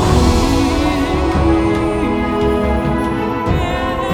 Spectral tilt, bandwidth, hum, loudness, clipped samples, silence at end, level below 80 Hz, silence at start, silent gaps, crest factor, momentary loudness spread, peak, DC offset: -6.5 dB/octave; 16.5 kHz; none; -16 LUFS; under 0.1%; 0 s; -22 dBFS; 0 s; none; 14 dB; 4 LU; 0 dBFS; under 0.1%